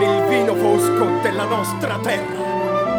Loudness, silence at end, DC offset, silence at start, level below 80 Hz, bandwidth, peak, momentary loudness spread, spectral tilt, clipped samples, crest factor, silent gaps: -19 LUFS; 0 s; under 0.1%; 0 s; -56 dBFS; over 20 kHz; -4 dBFS; 6 LU; -5 dB/octave; under 0.1%; 14 dB; none